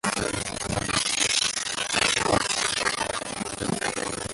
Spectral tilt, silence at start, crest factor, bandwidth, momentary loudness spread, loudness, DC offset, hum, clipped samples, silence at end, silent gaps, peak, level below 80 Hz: -2 dB/octave; 0.05 s; 20 dB; 12 kHz; 8 LU; -25 LUFS; under 0.1%; none; under 0.1%; 0 s; none; -6 dBFS; -48 dBFS